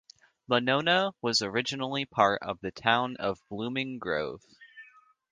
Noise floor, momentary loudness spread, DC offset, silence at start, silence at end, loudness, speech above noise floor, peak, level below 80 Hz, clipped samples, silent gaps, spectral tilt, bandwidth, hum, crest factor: -58 dBFS; 9 LU; under 0.1%; 0.5 s; 0.5 s; -28 LUFS; 29 dB; -6 dBFS; -66 dBFS; under 0.1%; none; -4 dB/octave; 10 kHz; none; 24 dB